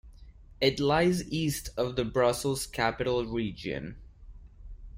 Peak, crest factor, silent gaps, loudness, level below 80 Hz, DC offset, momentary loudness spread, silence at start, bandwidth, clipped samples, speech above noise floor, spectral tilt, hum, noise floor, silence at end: -12 dBFS; 20 dB; none; -29 LUFS; -48 dBFS; under 0.1%; 10 LU; 0.05 s; 16 kHz; under 0.1%; 22 dB; -5 dB/octave; none; -51 dBFS; 0 s